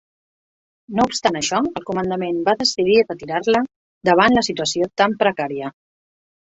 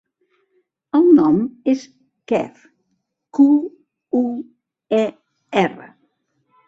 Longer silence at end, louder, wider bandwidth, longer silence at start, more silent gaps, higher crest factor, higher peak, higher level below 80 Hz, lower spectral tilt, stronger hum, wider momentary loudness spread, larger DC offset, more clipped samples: about the same, 0.8 s vs 0.8 s; about the same, -19 LUFS vs -18 LUFS; about the same, 8.2 kHz vs 7.6 kHz; about the same, 0.9 s vs 0.95 s; first, 3.76-4.01 s vs none; about the same, 18 dB vs 18 dB; about the same, -2 dBFS vs -2 dBFS; first, -54 dBFS vs -62 dBFS; second, -4 dB/octave vs -7 dB/octave; neither; second, 10 LU vs 14 LU; neither; neither